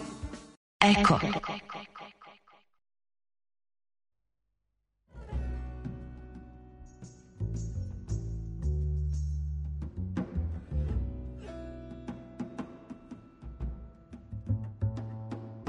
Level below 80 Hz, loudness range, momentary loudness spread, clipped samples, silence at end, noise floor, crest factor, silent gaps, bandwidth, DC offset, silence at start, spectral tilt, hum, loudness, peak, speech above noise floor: -40 dBFS; 15 LU; 21 LU; under 0.1%; 0 s; -84 dBFS; 26 dB; 0.57-0.80 s; 10.5 kHz; under 0.1%; 0 s; -6 dB/octave; none; -33 LUFS; -8 dBFS; 57 dB